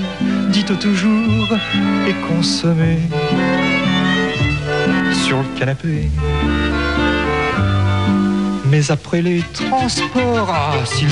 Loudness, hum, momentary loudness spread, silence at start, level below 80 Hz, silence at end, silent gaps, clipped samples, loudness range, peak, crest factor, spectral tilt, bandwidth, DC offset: -16 LUFS; none; 3 LU; 0 s; -30 dBFS; 0 s; none; under 0.1%; 1 LU; -2 dBFS; 14 dB; -5.5 dB/octave; 11 kHz; 0.4%